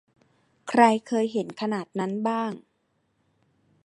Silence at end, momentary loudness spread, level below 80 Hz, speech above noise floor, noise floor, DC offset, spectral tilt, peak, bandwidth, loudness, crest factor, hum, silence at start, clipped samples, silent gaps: 1.25 s; 13 LU; -78 dBFS; 48 dB; -72 dBFS; under 0.1%; -5.5 dB/octave; -4 dBFS; 11 kHz; -25 LUFS; 24 dB; none; 0.65 s; under 0.1%; none